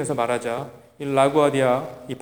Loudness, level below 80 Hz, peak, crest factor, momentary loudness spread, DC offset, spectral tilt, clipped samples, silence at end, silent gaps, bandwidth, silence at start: -21 LUFS; -64 dBFS; -4 dBFS; 18 dB; 16 LU; 0.1%; -5.5 dB/octave; under 0.1%; 0 s; none; over 20 kHz; 0 s